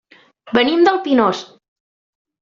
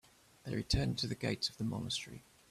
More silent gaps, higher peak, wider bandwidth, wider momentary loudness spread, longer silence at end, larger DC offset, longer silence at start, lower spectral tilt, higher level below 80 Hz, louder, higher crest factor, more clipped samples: neither; first, -2 dBFS vs -18 dBFS; second, 7.6 kHz vs 14.5 kHz; second, 7 LU vs 16 LU; first, 0.95 s vs 0.3 s; neither; about the same, 0.45 s vs 0.45 s; second, -2.5 dB/octave vs -4.5 dB/octave; second, -60 dBFS vs -52 dBFS; first, -15 LUFS vs -37 LUFS; about the same, 16 dB vs 20 dB; neither